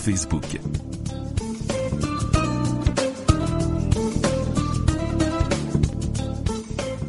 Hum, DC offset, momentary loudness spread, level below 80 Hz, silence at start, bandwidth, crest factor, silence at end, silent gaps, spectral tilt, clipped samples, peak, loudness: none; under 0.1%; 7 LU; -30 dBFS; 0 s; 11.5 kHz; 20 dB; 0 s; none; -6 dB/octave; under 0.1%; -2 dBFS; -24 LUFS